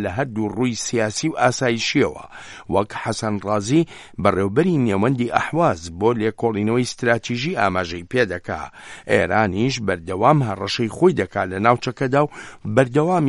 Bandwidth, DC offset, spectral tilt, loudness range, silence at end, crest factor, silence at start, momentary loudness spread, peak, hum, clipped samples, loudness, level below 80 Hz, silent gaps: 11.5 kHz; under 0.1%; -5.5 dB/octave; 2 LU; 0 s; 20 dB; 0 s; 7 LU; 0 dBFS; none; under 0.1%; -20 LUFS; -50 dBFS; none